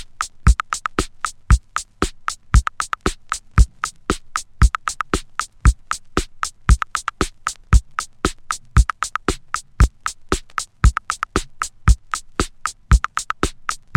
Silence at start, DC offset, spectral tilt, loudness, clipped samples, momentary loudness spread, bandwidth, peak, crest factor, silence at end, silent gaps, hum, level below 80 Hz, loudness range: 0 s; under 0.1%; -4.5 dB/octave; -22 LUFS; under 0.1%; 10 LU; 13 kHz; 0 dBFS; 20 dB; 0.2 s; none; none; -22 dBFS; 1 LU